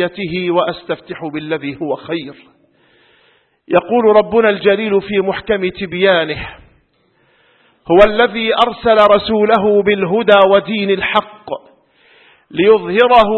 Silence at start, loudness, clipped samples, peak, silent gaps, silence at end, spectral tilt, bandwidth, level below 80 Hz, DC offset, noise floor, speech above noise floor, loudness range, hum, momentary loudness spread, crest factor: 0 s; -13 LUFS; under 0.1%; 0 dBFS; none; 0 s; -7 dB/octave; 5.8 kHz; -42 dBFS; under 0.1%; -57 dBFS; 44 dB; 9 LU; none; 14 LU; 14 dB